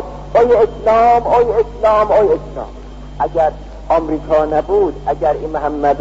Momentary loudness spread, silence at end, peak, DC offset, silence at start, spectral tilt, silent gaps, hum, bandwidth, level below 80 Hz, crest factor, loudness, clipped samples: 13 LU; 0 s; -4 dBFS; 0.1%; 0 s; -7 dB/octave; none; none; 7.8 kHz; -32 dBFS; 12 dB; -14 LUFS; under 0.1%